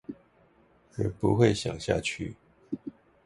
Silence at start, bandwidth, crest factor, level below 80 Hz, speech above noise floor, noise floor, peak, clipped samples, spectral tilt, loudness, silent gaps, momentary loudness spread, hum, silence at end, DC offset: 0.1 s; 11.5 kHz; 22 dB; -52 dBFS; 35 dB; -62 dBFS; -8 dBFS; under 0.1%; -6 dB/octave; -29 LUFS; none; 21 LU; none; 0.35 s; under 0.1%